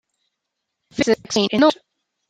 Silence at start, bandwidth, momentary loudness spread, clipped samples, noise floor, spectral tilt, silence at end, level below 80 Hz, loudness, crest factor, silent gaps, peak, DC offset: 0.95 s; 12 kHz; 16 LU; under 0.1%; -79 dBFS; -4 dB/octave; 0.55 s; -58 dBFS; -18 LUFS; 20 dB; none; -2 dBFS; under 0.1%